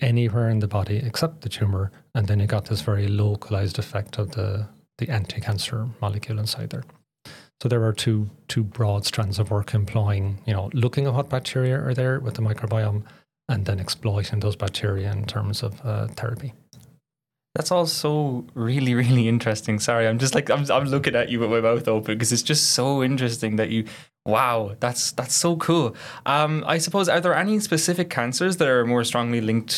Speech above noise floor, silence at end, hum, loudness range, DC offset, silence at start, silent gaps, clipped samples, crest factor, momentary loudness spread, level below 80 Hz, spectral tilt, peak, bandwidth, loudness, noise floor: 65 dB; 0 s; none; 6 LU; under 0.1%; 0 s; none; under 0.1%; 18 dB; 8 LU; -60 dBFS; -5 dB/octave; -4 dBFS; 15 kHz; -23 LUFS; -87 dBFS